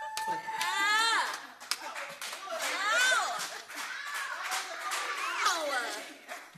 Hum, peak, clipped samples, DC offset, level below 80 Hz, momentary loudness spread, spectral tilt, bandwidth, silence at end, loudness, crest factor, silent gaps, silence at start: 50 Hz at -80 dBFS; -10 dBFS; under 0.1%; under 0.1%; -86 dBFS; 13 LU; 1 dB/octave; 14 kHz; 0 s; -31 LUFS; 24 dB; none; 0 s